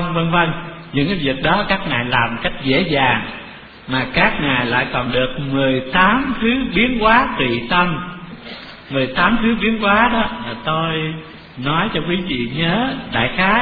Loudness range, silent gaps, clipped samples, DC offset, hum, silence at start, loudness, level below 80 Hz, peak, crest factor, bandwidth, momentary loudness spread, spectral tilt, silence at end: 2 LU; none; under 0.1%; under 0.1%; none; 0 s; -17 LUFS; -36 dBFS; 0 dBFS; 18 dB; 5 kHz; 12 LU; -8.5 dB/octave; 0 s